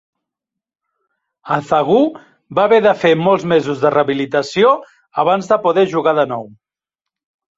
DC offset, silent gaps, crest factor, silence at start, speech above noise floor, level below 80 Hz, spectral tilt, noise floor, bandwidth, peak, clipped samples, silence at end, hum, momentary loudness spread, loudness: under 0.1%; none; 14 dB; 1.45 s; 70 dB; -58 dBFS; -6 dB/octave; -84 dBFS; 7.8 kHz; -2 dBFS; under 0.1%; 1.1 s; none; 8 LU; -15 LUFS